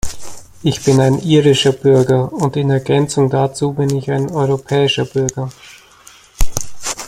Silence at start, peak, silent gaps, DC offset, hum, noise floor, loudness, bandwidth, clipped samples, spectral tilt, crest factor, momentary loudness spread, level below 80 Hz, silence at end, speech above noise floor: 0.05 s; 0 dBFS; none; under 0.1%; none; -44 dBFS; -15 LUFS; 15.5 kHz; under 0.1%; -5.5 dB/octave; 14 dB; 11 LU; -32 dBFS; 0 s; 30 dB